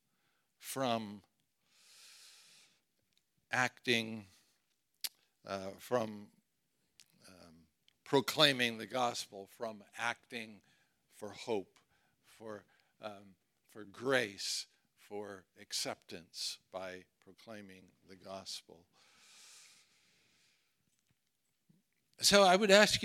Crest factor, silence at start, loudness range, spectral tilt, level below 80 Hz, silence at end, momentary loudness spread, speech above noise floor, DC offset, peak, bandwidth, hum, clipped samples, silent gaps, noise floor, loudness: 30 dB; 0.65 s; 15 LU; -2.5 dB/octave; -74 dBFS; 0 s; 25 LU; 48 dB; under 0.1%; -10 dBFS; 17.5 kHz; none; under 0.1%; none; -83 dBFS; -34 LUFS